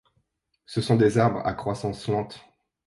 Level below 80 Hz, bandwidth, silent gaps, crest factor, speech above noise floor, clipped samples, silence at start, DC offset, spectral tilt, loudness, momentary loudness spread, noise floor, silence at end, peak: -54 dBFS; 11.5 kHz; none; 20 dB; 49 dB; under 0.1%; 0.7 s; under 0.1%; -7 dB/octave; -25 LUFS; 13 LU; -73 dBFS; 0.5 s; -6 dBFS